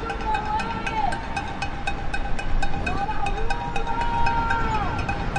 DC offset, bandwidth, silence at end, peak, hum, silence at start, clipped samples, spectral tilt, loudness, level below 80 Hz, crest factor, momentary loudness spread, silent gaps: under 0.1%; 9.4 kHz; 0 s; -8 dBFS; none; 0 s; under 0.1%; -5.5 dB/octave; -26 LUFS; -28 dBFS; 14 dB; 6 LU; none